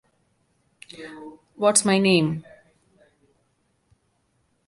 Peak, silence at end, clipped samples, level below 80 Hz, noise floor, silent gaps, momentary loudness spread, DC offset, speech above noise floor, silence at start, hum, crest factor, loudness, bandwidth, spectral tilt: -2 dBFS; 2.25 s; under 0.1%; -66 dBFS; -69 dBFS; none; 25 LU; under 0.1%; 47 dB; 1 s; none; 24 dB; -20 LUFS; 11.5 kHz; -4 dB/octave